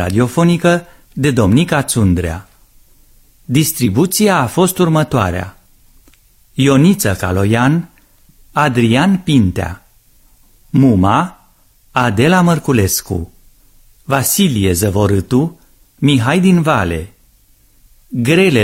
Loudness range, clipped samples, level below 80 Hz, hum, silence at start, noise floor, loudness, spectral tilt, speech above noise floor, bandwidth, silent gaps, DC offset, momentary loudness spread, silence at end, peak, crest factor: 2 LU; under 0.1%; -38 dBFS; none; 0 s; -50 dBFS; -13 LUFS; -5.5 dB/octave; 38 dB; 16.5 kHz; none; under 0.1%; 13 LU; 0 s; 0 dBFS; 14 dB